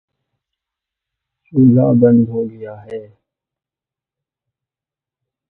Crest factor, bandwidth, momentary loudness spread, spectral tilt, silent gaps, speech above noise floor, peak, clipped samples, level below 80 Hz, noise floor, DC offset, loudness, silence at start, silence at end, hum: 18 dB; 3 kHz; 20 LU; -13.5 dB/octave; none; 75 dB; 0 dBFS; under 0.1%; -56 dBFS; -88 dBFS; under 0.1%; -13 LUFS; 1.55 s; 2.45 s; none